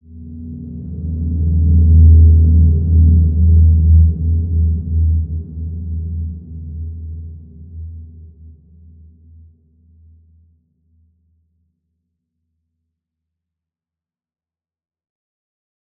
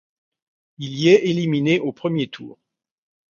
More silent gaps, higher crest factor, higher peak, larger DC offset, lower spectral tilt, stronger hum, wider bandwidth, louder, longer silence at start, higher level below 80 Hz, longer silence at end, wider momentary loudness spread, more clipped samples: neither; second, 14 dB vs 20 dB; about the same, -2 dBFS vs -2 dBFS; neither; first, -17 dB/octave vs -6.5 dB/octave; neither; second, 0.6 kHz vs 7.2 kHz; first, -13 LUFS vs -19 LUFS; second, 0.15 s vs 0.8 s; first, -22 dBFS vs -64 dBFS; first, 7.75 s vs 0.85 s; first, 23 LU vs 16 LU; neither